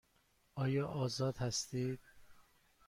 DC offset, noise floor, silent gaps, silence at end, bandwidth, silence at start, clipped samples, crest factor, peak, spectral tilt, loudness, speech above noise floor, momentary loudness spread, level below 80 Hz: under 0.1%; -74 dBFS; none; 0.45 s; 16 kHz; 0.55 s; under 0.1%; 16 dB; -26 dBFS; -5 dB/octave; -39 LUFS; 37 dB; 8 LU; -68 dBFS